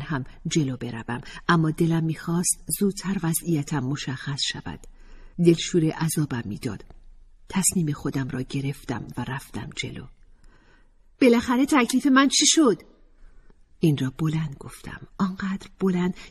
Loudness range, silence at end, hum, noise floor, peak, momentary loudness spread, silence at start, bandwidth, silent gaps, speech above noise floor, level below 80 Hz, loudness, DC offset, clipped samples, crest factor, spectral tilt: 7 LU; 0 s; none; -55 dBFS; -4 dBFS; 14 LU; 0 s; 14.5 kHz; none; 31 dB; -50 dBFS; -24 LUFS; under 0.1%; under 0.1%; 20 dB; -4.5 dB/octave